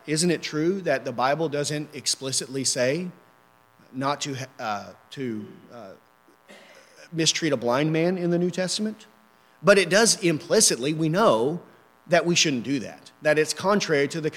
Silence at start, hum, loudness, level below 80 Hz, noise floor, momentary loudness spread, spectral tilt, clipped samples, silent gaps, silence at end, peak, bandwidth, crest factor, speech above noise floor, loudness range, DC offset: 0.05 s; none; -23 LUFS; -72 dBFS; -58 dBFS; 16 LU; -3.5 dB/octave; under 0.1%; none; 0 s; -2 dBFS; 16.5 kHz; 22 dB; 34 dB; 12 LU; under 0.1%